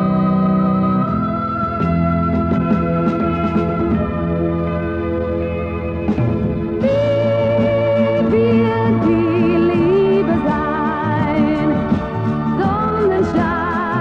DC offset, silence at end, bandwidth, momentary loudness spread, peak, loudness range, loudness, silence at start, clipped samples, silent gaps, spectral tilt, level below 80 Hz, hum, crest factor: under 0.1%; 0 s; 6.8 kHz; 5 LU; -2 dBFS; 4 LU; -17 LUFS; 0 s; under 0.1%; none; -9.5 dB/octave; -34 dBFS; none; 14 dB